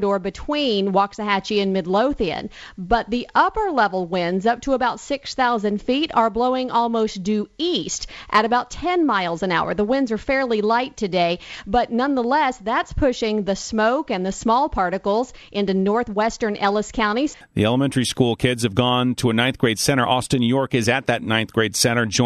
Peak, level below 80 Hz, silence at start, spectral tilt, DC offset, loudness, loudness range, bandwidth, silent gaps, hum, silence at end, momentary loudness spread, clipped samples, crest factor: -2 dBFS; -42 dBFS; 0 s; -4.5 dB/octave; under 0.1%; -21 LUFS; 2 LU; 14 kHz; none; none; 0 s; 5 LU; under 0.1%; 18 dB